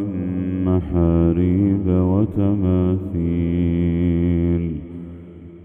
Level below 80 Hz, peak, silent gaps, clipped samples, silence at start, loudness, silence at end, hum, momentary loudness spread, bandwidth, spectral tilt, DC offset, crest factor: -34 dBFS; -4 dBFS; none; under 0.1%; 0 s; -19 LUFS; 0 s; none; 13 LU; 3.6 kHz; -12 dB/octave; under 0.1%; 14 dB